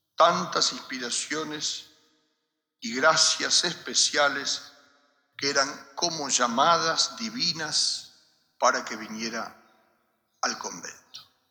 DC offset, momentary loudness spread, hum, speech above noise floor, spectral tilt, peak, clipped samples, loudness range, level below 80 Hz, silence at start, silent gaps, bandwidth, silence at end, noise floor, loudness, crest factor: under 0.1%; 13 LU; none; 53 dB; -1 dB/octave; -6 dBFS; under 0.1%; 5 LU; -82 dBFS; 0.2 s; none; over 20 kHz; 0.3 s; -79 dBFS; -25 LUFS; 20 dB